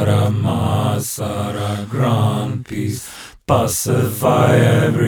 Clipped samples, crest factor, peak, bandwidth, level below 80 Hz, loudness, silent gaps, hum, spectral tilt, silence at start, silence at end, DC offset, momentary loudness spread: under 0.1%; 16 dB; -2 dBFS; over 20 kHz; -46 dBFS; -17 LUFS; none; none; -6 dB/octave; 0 s; 0 s; under 0.1%; 11 LU